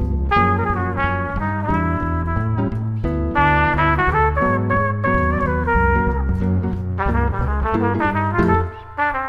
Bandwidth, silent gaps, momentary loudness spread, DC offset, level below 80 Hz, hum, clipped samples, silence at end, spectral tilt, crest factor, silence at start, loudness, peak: 5.6 kHz; none; 6 LU; under 0.1%; -26 dBFS; none; under 0.1%; 0 s; -9 dB/octave; 16 dB; 0 s; -19 LUFS; -2 dBFS